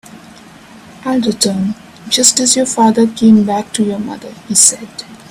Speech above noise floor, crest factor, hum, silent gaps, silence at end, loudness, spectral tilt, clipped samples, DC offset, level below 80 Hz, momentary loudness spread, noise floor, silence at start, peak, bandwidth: 25 dB; 14 dB; none; none; 0.15 s; -11 LUFS; -3 dB/octave; 0.1%; under 0.1%; -52 dBFS; 17 LU; -38 dBFS; 0.15 s; 0 dBFS; over 20 kHz